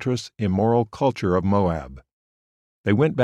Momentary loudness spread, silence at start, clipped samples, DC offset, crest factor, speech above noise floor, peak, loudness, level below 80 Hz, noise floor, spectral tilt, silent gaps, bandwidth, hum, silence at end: 9 LU; 0 s; under 0.1%; under 0.1%; 16 dB; over 69 dB; -6 dBFS; -22 LUFS; -48 dBFS; under -90 dBFS; -7.5 dB/octave; 2.13-2.84 s; 11 kHz; none; 0 s